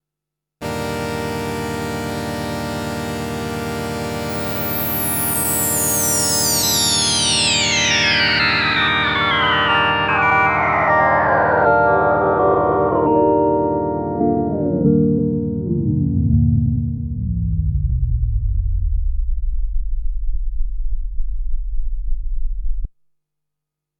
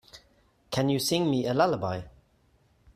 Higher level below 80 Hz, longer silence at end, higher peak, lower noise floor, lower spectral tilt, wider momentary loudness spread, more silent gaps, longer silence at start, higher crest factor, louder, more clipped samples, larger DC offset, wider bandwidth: first, -26 dBFS vs -60 dBFS; first, 1.1 s vs 0.85 s; first, -2 dBFS vs -10 dBFS; first, -83 dBFS vs -65 dBFS; second, -3.5 dB/octave vs -5 dB/octave; first, 15 LU vs 9 LU; neither; first, 0.6 s vs 0.15 s; about the same, 16 dB vs 20 dB; first, -17 LUFS vs -27 LUFS; neither; neither; first, over 20 kHz vs 15.5 kHz